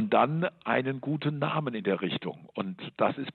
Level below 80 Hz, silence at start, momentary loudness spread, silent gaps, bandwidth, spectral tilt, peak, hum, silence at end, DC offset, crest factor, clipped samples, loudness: -74 dBFS; 0 s; 10 LU; none; 4.4 kHz; -9.5 dB/octave; -10 dBFS; none; 0.05 s; under 0.1%; 20 dB; under 0.1%; -30 LUFS